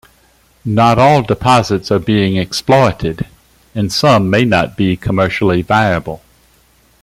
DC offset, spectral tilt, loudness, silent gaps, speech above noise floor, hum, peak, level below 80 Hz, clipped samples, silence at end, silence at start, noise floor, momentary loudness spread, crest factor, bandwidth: under 0.1%; -6 dB/octave; -13 LUFS; none; 39 dB; none; 0 dBFS; -40 dBFS; under 0.1%; 0.85 s; 0.65 s; -51 dBFS; 12 LU; 14 dB; 15.5 kHz